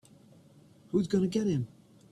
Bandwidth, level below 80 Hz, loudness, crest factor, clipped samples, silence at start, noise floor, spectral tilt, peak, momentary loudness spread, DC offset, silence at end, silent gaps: 11.5 kHz; -64 dBFS; -30 LUFS; 18 dB; under 0.1%; 0.95 s; -58 dBFS; -7.5 dB/octave; -16 dBFS; 6 LU; under 0.1%; 0.45 s; none